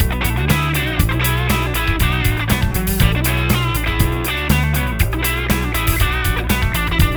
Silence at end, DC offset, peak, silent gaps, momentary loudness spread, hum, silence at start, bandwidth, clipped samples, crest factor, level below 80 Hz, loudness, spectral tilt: 0 s; under 0.1%; 0 dBFS; none; 2 LU; none; 0 s; over 20 kHz; under 0.1%; 16 dB; -22 dBFS; -17 LUFS; -4.5 dB/octave